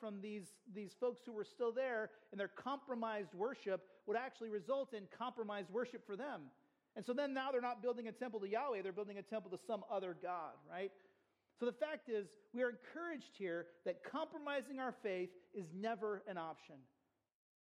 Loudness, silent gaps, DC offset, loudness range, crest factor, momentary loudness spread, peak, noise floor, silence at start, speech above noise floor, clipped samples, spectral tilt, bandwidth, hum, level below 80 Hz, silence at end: -45 LUFS; none; under 0.1%; 2 LU; 18 dB; 9 LU; -28 dBFS; -79 dBFS; 0 s; 34 dB; under 0.1%; -5.5 dB/octave; 12 kHz; none; under -90 dBFS; 0.85 s